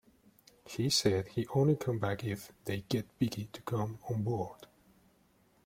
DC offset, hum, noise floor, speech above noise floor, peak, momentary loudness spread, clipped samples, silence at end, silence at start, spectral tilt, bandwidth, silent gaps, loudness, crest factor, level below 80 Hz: under 0.1%; none; -68 dBFS; 35 dB; -14 dBFS; 11 LU; under 0.1%; 1 s; 0.65 s; -5.5 dB/octave; 16.5 kHz; none; -34 LUFS; 20 dB; -64 dBFS